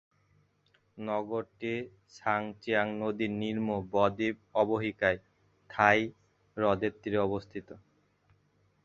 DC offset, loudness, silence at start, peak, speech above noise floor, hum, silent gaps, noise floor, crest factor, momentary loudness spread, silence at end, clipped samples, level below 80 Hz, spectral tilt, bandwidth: under 0.1%; -31 LUFS; 0.95 s; -6 dBFS; 39 dB; none; none; -70 dBFS; 26 dB; 12 LU; 1.05 s; under 0.1%; -62 dBFS; -6.5 dB/octave; 7.4 kHz